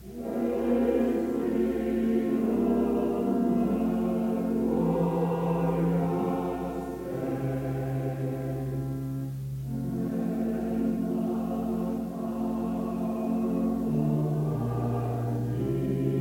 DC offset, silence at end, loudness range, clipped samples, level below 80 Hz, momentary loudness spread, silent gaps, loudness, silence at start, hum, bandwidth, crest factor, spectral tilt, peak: under 0.1%; 0 s; 5 LU; under 0.1%; -48 dBFS; 6 LU; none; -29 LUFS; 0 s; none; 17 kHz; 12 dB; -9 dB/octave; -14 dBFS